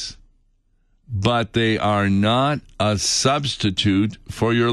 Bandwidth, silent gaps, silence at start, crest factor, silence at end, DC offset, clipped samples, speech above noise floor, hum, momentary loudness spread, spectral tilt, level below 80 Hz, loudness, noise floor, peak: 12.5 kHz; none; 0 s; 18 dB; 0 s; under 0.1%; under 0.1%; 42 dB; none; 6 LU; -4.5 dB/octave; -46 dBFS; -20 LUFS; -61 dBFS; -4 dBFS